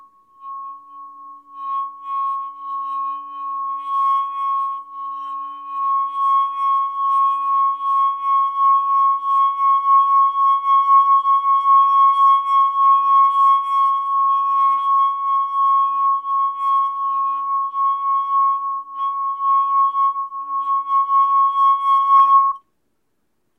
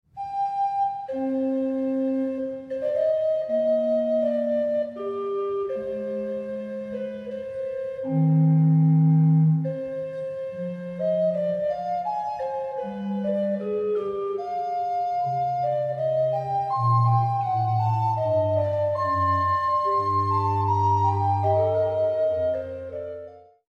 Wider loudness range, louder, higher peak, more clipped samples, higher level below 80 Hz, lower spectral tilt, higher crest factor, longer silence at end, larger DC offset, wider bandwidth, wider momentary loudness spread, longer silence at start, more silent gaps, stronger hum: first, 9 LU vs 6 LU; first, -17 LUFS vs -24 LUFS; first, -6 dBFS vs -12 dBFS; neither; second, -80 dBFS vs -62 dBFS; second, 0 dB/octave vs -10 dB/octave; about the same, 12 dB vs 12 dB; first, 1 s vs 0.3 s; neither; second, 3.5 kHz vs 6 kHz; about the same, 14 LU vs 12 LU; first, 0.4 s vs 0.15 s; neither; neither